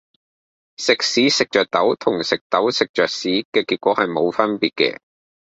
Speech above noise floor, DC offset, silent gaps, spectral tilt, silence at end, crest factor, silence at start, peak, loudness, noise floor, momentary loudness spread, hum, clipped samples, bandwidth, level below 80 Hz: over 71 dB; under 0.1%; 2.41-2.50 s, 2.89-2.94 s, 3.45-3.52 s; -3 dB/octave; 0.65 s; 18 dB; 0.8 s; -2 dBFS; -19 LUFS; under -90 dBFS; 5 LU; none; under 0.1%; 8.2 kHz; -62 dBFS